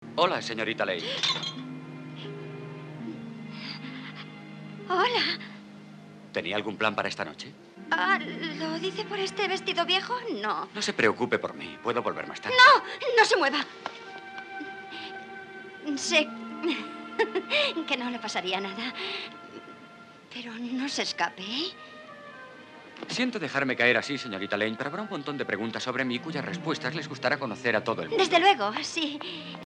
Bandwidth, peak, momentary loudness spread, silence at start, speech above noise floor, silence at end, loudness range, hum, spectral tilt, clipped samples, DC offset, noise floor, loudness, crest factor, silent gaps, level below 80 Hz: 11 kHz; -6 dBFS; 19 LU; 0 s; 22 dB; 0 s; 10 LU; none; -3 dB/octave; under 0.1%; under 0.1%; -50 dBFS; -27 LUFS; 22 dB; none; -78 dBFS